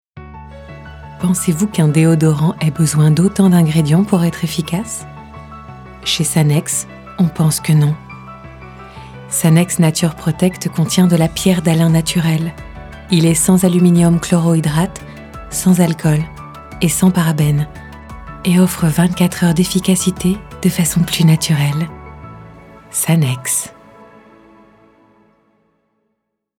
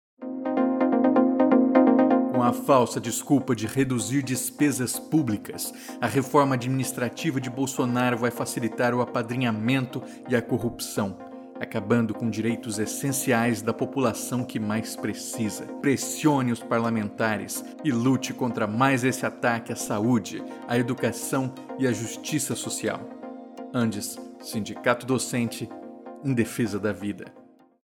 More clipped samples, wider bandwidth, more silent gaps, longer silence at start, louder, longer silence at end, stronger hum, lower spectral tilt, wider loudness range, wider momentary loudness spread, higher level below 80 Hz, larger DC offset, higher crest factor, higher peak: neither; about the same, 17 kHz vs 17.5 kHz; neither; about the same, 0.15 s vs 0.2 s; first, -14 LUFS vs -25 LUFS; first, 2.9 s vs 0.5 s; neither; about the same, -5.5 dB/octave vs -5 dB/octave; about the same, 5 LU vs 7 LU; first, 22 LU vs 12 LU; first, -40 dBFS vs -64 dBFS; neither; second, 14 dB vs 20 dB; first, 0 dBFS vs -6 dBFS